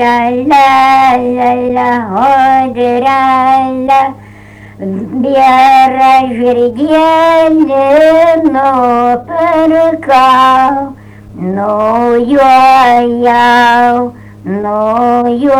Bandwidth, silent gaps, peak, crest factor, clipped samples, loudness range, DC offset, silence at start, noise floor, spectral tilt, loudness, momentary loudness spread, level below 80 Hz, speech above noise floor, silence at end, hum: 16 kHz; none; 0 dBFS; 8 dB; under 0.1%; 2 LU; under 0.1%; 0 s; -33 dBFS; -5.5 dB/octave; -8 LUFS; 10 LU; -44 dBFS; 25 dB; 0 s; none